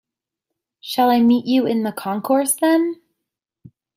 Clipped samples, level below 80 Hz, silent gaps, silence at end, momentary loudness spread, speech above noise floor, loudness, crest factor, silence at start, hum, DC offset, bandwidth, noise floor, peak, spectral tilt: under 0.1%; -68 dBFS; none; 1 s; 11 LU; 65 dB; -18 LUFS; 16 dB; 0.85 s; none; under 0.1%; 16 kHz; -83 dBFS; -4 dBFS; -4 dB/octave